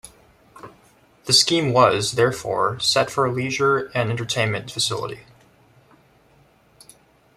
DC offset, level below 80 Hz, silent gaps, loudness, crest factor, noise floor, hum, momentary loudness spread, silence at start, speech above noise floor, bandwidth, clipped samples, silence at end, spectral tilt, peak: under 0.1%; -58 dBFS; none; -20 LUFS; 20 dB; -56 dBFS; none; 8 LU; 0.05 s; 36 dB; 15.5 kHz; under 0.1%; 2.15 s; -3.5 dB/octave; -2 dBFS